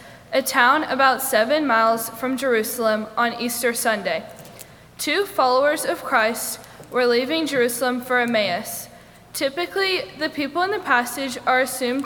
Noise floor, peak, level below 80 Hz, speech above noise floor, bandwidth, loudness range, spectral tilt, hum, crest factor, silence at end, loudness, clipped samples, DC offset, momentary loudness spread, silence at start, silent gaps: -43 dBFS; -2 dBFS; -60 dBFS; 23 dB; over 20 kHz; 4 LU; -2.5 dB/octave; none; 20 dB; 0 s; -21 LUFS; under 0.1%; under 0.1%; 10 LU; 0 s; none